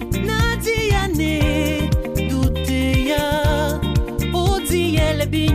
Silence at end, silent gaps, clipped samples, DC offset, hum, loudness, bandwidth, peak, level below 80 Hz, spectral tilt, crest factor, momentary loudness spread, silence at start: 0 s; none; under 0.1%; under 0.1%; none; -19 LUFS; 15.5 kHz; -6 dBFS; -24 dBFS; -5.5 dB/octave; 12 dB; 3 LU; 0 s